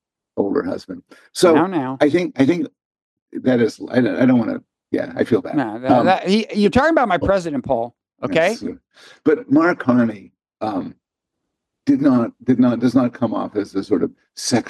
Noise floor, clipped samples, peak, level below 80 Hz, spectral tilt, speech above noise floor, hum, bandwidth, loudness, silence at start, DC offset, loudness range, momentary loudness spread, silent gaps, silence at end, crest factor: -79 dBFS; under 0.1%; 0 dBFS; -52 dBFS; -6 dB/octave; 62 dB; none; 12.5 kHz; -18 LUFS; 0.35 s; under 0.1%; 2 LU; 13 LU; 2.85-2.91 s, 3.02-3.26 s; 0 s; 18 dB